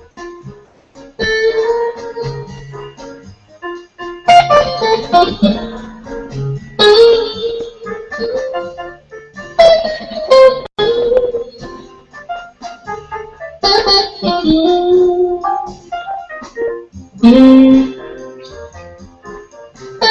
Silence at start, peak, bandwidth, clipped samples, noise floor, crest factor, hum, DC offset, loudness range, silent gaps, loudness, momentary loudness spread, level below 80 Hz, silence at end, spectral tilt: 0.15 s; 0 dBFS; 9.6 kHz; 0.5%; -40 dBFS; 14 dB; none; under 0.1%; 6 LU; none; -12 LUFS; 24 LU; -40 dBFS; 0 s; -5.5 dB/octave